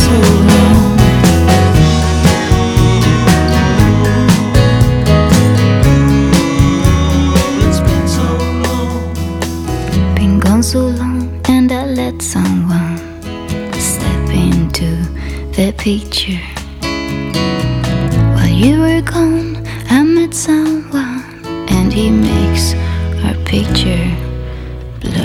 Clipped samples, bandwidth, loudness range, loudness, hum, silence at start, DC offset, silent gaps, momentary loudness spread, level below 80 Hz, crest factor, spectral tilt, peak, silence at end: 0.5%; 19 kHz; 6 LU; -12 LUFS; none; 0 s; under 0.1%; none; 11 LU; -20 dBFS; 12 dB; -6 dB/octave; 0 dBFS; 0 s